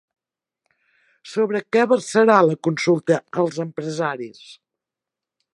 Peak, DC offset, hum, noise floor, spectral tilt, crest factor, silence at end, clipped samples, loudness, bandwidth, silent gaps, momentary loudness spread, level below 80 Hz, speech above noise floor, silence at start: -2 dBFS; under 0.1%; none; -87 dBFS; -5.5 dB/octave; 20 dB; 1 s; under 0.1%; -20 LUFS; 11.5 kHz; none; 13 LU; -74 dBFS; 67 dB; 1.25 s